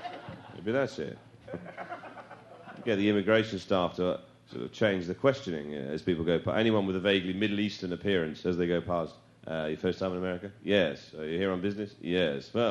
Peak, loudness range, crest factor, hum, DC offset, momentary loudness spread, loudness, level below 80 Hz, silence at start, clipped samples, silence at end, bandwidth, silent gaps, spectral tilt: -10 dBFS; 3 LU; 20 dB; none; under 0.1%; 16 LU; -30 LUFS; -62 dBFS; 0 s; under 0.1%; 0 s; 11 kHz; none; -6.5 dB/octave